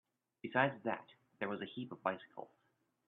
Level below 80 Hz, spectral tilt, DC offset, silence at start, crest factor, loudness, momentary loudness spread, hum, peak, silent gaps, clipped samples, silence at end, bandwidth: -84 dBFS; -3.5 dB/octave; under 0.1%; 0.45 s; 26 dB; -40 LUFS; 18 LU; none; -16 dBFS; none; under 0.1%; 0.6 s; 4.2 kHz